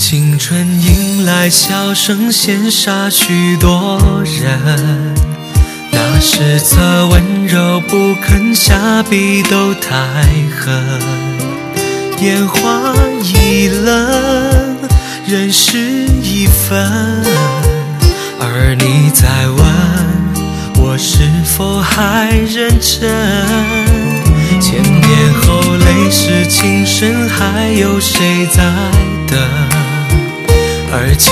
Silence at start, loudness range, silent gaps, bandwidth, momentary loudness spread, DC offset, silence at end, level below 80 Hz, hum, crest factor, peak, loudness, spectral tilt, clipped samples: 0 s; 2 LU; none; 16 kHz; 6 LU; under 0.1%; 0 s; -18 dBFS; none; 10 dB; 0 dBFS; -10 LUFS; -4.5 dB/octave; 0.6%